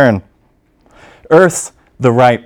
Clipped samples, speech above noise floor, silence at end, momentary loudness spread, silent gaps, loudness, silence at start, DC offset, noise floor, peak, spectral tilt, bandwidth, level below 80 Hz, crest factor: 0.6%; 44 dB; 0.05 s; 12 LU; none; -12 LUFS; 0 s; under 0.1%; -54 dBFS; 0 dBFS; -5.5 dB/octave; 18 kHz; -50 dBFS; 12 dB